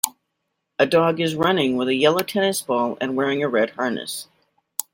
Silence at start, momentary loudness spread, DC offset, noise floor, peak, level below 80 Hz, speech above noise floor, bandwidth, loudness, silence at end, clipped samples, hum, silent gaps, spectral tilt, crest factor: 0.05 s; 12 LU; under 0.1%; -77 dBFS; 0 dBFS; -64 dBFS; 56 dB; 16.5 kHz; -21 LUFS; 0.1 s; under 0.1%; none; none; -4 dB/octave; 22 dB